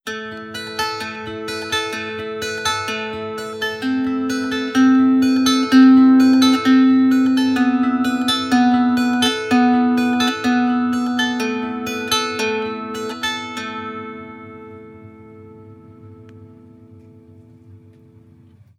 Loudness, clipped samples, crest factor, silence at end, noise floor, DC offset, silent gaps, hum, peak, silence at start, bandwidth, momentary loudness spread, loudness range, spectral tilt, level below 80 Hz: -17 LUFS; under 0.1%; 16 dB; 1 s; -48 dBFS; under 0.1%; none; none; -2 dBFS; 0.05 s; 14.5 kHz; 15 LU; 14 LU; -3.5 dB/octave; -60 dBFS